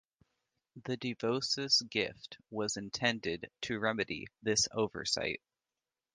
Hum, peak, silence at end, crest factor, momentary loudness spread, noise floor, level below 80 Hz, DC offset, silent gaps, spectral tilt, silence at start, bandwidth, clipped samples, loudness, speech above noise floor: none; -14 dBFS; 0.75 s; 22 dB; 12 LU; under -90 dBFS; -66 dBFS; under 0.1%; none; -2.5 dB/octave; 0.75 s; 10.5 kHz; under 0.1%; -34 LUFS; over 55 dB